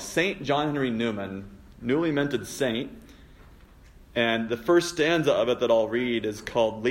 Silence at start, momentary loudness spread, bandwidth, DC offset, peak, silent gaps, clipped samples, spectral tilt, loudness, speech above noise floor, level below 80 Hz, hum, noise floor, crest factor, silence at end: 0 s; 10 LU; 16 kHz; under 0.1%; -10 dBFS; none; under 0.1%; -5 dB/octave; -26 LUFS; 26 dB; -54 dBFS; none; -51 dBFS; 16 dB; 0 s